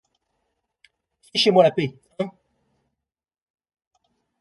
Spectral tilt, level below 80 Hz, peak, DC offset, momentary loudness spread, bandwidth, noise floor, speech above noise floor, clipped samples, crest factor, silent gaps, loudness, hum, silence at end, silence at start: -5 dB/octave; -70 dBFS; -2 dBFS; under 0.1%; 15 LU; 11.5 kHz; -87 dBFS; 67 dB; under 0.1%; 24 dB; none; -21 LUFS; none; 2.1 s; 1.35 s